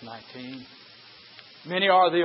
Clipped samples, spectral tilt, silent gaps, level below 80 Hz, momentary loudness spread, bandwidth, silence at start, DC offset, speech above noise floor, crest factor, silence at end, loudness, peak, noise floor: under 0.1%; -8.5 dB/octave; none; -78 dBFS; 27 LU; 5.8 kHz; 0 s; under 0.1%; 26 dB; 20 dB; 0 s; -22 LUFS; -6 dBFS; -50 dBFS